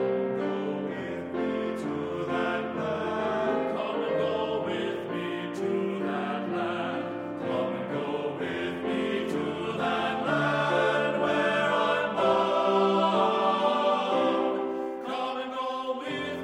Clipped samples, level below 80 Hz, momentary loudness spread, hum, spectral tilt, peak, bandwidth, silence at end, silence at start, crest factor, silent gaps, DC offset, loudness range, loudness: under 0.1%; -68 dBFS; 8 LU; none; -6 dB/octave; -12 dBFS; 12 kHz; 0 s; 0 s; 16 dB; none; under 0.1%; 6 LU; -28 LUFS